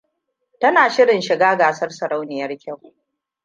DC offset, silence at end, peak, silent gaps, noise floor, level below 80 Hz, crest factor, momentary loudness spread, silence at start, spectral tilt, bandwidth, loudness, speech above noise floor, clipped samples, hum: under 0.1%; 0.7 s; -2 dBFS; none; -73 dBFS; -74 dBFS; 18 dB; 16 LU; 0.6 s; -4 dB/octave; 9.2 kHz; -17 LUFS; 56 dB; under 0.1%; none